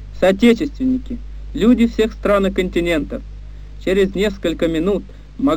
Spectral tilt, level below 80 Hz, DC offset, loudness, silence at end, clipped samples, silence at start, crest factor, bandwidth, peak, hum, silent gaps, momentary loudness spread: -6.5 dB/octave; -32 dBFS; 0.5%; -17 LUFS; 0 s; under 0.1%; 0 s; 16 dB; 15.5 kHz; -2 dBFS; 50 Hz at -30 dBFS; none; 17 LU